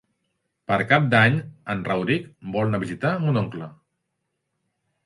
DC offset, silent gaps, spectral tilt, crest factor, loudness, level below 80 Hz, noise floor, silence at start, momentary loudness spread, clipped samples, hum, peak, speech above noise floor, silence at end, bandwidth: under 0.1%; none; -7.5 dB/octave; 22 dB; -22 LUFS; -58 dBFS; -78 dBFS; 0.7 s; 13 LU; under 0.1%; none; -2 dBFS; 55 dB; 1.35 s; 11.5 kHz